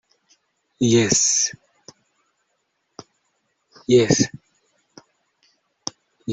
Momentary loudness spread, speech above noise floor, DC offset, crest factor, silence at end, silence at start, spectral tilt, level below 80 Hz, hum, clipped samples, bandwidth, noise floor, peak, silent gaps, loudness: 18 LU; 55 dB; under 0.1%; 22 dB; 0 s; 0.8 s; -3.5 dB/octave; -58 dBFS; none; under 0.1%; 8.2 kHz; -72 dBFS; -2 dBFS; none; -18 LUFS